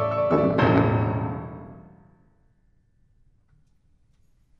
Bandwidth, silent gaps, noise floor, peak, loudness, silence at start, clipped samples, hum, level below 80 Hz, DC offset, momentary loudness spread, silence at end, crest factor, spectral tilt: 5.8 kHz; none; -63 dBFS; -6 dBFS; -22 LUFS; 0 s; under 0.1%; none; -48 dBFS; under 0.1%; 21 LU; 2.8 s; 20 dB; -9.5 dB/octave